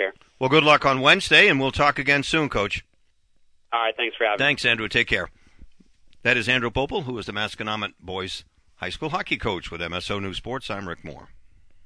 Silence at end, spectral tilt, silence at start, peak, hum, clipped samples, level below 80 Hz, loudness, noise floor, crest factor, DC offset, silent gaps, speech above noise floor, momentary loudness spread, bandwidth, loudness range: 0 s; -4 dB/octave; 0 s; -2 dBFS; none; under 0.1%; -46 dBFS; -21 LUFS; -61 dBFS; 20 dB; under 0.1%; none; 38 dB; 16 LU; 11 kHz; 11 LU